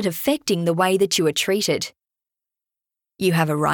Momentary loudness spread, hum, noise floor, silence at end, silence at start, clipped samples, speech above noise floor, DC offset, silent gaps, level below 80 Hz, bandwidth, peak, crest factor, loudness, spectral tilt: 5 LU; none; -88 dBFS; 0 s; 0 s; under 0.1%; 67 dB; under 0.1%; none; -62 dBFS; 18 kHz; -6 dBFS; 16 dB; -20 LUFS; -4.5 dB/octave